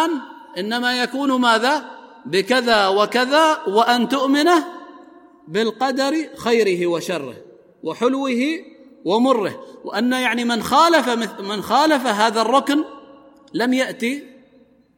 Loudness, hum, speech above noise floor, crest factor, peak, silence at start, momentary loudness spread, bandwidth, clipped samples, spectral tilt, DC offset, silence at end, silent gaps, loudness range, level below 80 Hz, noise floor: -18 LUFS; none; 35 dB; 18 dB; -2 dBFS; 0 s; 14 LU; 16.5 kHz; under 0.1%; -3.5 dB/octave; under 0.1%; 0.7 s; none; 4 LU; -64 dBFS; -53 dBFS